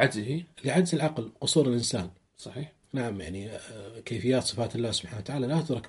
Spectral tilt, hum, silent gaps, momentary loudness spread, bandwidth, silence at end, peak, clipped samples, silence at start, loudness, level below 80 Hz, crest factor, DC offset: -5 dB/octave; none; none; 16 LU; 11.5 kHz; 0 s; -6 dBFS; under 0.1%; 0 s; -29 LUFS; -60 dBFS; 22 dB; under 0.1%